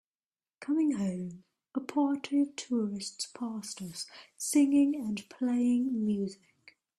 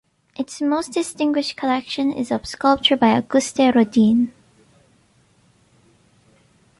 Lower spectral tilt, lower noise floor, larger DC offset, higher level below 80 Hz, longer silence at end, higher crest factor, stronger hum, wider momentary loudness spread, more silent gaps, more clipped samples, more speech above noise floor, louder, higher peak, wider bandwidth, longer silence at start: about the same, -5 dB/octave vs -4.5 dB/octave; first, under -90 dBFS vs -58 dBFS; neither; second, -74 dBFS vs -58 dBFS; second, 0.65 s vs 2.5 s; about the same, 16 dB vs 18 dB; neither; first, 13 LU vs 9 LU; neither; neither; first, over 59 dB vs 39 dB; second, -31 LUFS vs -19 LUFS; second, -16 dBFS vs -4 dBFS; first, 13 kHz vs 11.5 kHz; first, 0.6 s vs 0.4 s